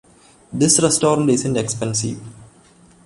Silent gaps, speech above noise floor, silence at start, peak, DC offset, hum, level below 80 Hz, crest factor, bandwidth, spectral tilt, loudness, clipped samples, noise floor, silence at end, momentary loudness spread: none; 32 dB; 0.5 s; -2 dBFS; under 0.1%; none; -52 dBFS; 18 dB; 11.5 kHz; -4 dB/octave; -17 LUFS; under 0.1%; -50 dBFS; 0.6 s; 14 LU